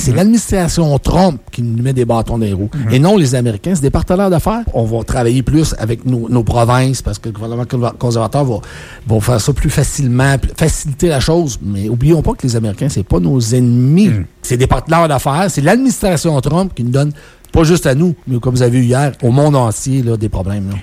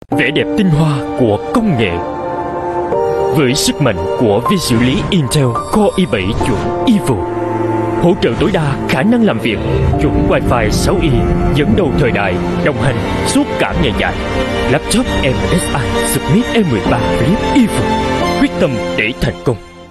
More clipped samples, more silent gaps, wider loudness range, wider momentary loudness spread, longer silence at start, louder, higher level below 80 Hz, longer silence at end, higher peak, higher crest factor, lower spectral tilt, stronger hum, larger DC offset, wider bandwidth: neither; neither; about the same, 3 LU vs 1 LU; first, 7 LU vs 4 LU; about the same, 0 s vs 0.1 s; about the same, -13 LUFS vs -13 LUFS; about the same, -26 dBFS vs -26 dBFS; about the same, 0 s vs 0 s; about the same, 0 dBFS vs -2 dBFS; about the same, 12 dB vs 12 dB; about the same, -6.5 dB/octave vs -5.5 dB/octave; neither; neither; first, 16 kHz vs 13.5 kHz